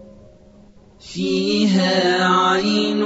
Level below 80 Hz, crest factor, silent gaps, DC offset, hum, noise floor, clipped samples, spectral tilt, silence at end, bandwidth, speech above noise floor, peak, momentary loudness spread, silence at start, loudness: -54 dBFS; 14 dB; none; under 0.1%; none; -47 dBFS; under 0.1%; -5 dB/octave; 0 s; 8 kHz; 30 dB; -4 dBFS; 7 LU; 0 s; -17 LUFS